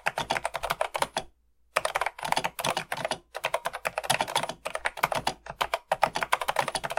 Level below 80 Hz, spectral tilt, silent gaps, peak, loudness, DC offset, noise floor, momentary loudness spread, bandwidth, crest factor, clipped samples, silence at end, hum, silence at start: -56 dBFS; -2 dB/octave; none; -2 dBFS; -30 LUFS; under 0.1%; -61 dBFS; 6 LU; 17 kHz; 28 dB; under 0.1%; 0 s; none; 0.05 s